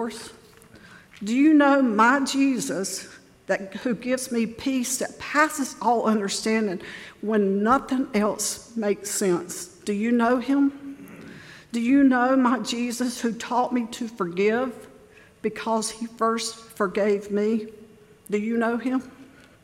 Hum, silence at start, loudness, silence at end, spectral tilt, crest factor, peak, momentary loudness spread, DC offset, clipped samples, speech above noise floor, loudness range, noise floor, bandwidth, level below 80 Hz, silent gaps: none; 0 s; -24 LUFS; 0.4 s; -4 dB/octave; 18 dB; -6 dBFS; 14 LU; under 0.1%; under 0.1%; 28 dB; 5 LU; -51 dBFS; 16.5 kHz; -62 dBFS; none